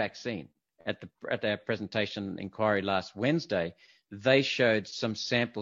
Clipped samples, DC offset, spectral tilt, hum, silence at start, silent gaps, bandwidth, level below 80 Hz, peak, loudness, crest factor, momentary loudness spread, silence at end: under 0.1%; under 0.1%; -5 dB/octave; none; 0 s; none; 7.8 kHz; -68 dBFS; -8 dBFS; -30 LUFS; 22 dB; 13 LU; 0 s